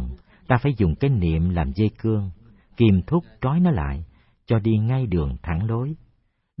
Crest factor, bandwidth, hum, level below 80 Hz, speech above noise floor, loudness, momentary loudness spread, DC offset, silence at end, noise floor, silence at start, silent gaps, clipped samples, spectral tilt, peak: 18 dB; 5.6 kHz; none; -36 dBFS; 44 dB; -22 LUFS; 13 LU; under 0.1%; 0.65 s; -65 dBFS; 0 s; none; under 0.1%; -13 dB/octave; -4 dBFS